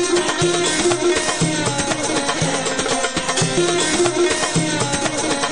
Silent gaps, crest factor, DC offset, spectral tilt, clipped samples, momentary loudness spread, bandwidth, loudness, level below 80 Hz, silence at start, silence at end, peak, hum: none; 16 dB; 1%; -3 dB/octave; under 0.1%; 3 LU; 11 kHz; -18 LUFS; -44 dBFS; 0 s; 0 s; -4 dBFS; none